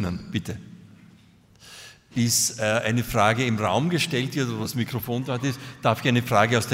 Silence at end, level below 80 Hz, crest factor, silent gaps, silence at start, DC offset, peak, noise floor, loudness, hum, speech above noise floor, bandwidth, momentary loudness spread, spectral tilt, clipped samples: 0 s; -52 dBFS; 20 dB; none; 0 s; under 0.1%; -4 dBFS; -54 dBFS; -24 LUFS; none; 30 dB; 16 kHz; 12 LU; -4.5 dB/octave; under 0.1%